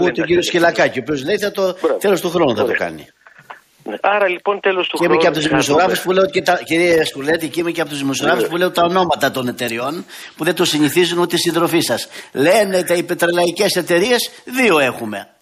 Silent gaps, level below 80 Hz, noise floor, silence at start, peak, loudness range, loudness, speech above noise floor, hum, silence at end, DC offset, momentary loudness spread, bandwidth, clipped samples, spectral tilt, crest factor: none; -54 dBFS; -41 dBFS; 0 s; -2 dBFS; 3 LU; -16 LUFS; 24 dB; none; 0.2 s; under 0.1%; 8 LU; 15 kHz; under 0.1%; -4 dB/octave; 14 dB